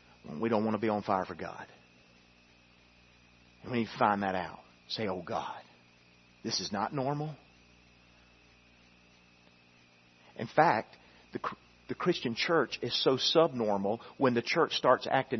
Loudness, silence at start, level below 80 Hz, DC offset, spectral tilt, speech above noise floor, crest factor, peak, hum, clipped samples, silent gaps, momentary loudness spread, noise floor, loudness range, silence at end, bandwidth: -31 LUFS; 0.25 s; -70 dBFS; under 0.1%; -3 dB/octave; 31 dB; 24 dB; -8 dBFS; 60 Hz at -65 dBFS; under 0.1%; none; 18 LU; -62 dBFS; 9 LU; 0 s; 6.2 kHz